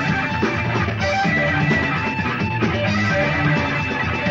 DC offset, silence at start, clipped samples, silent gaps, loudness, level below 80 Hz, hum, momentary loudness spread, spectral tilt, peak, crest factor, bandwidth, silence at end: under 0.1%; 0 s; under 0.1%; none; -19 LUFS; -40 dBFS; none; 3 LU; -6 dB/octave; -6 dBFS; 14 dB; 7.8 kHz; 0 s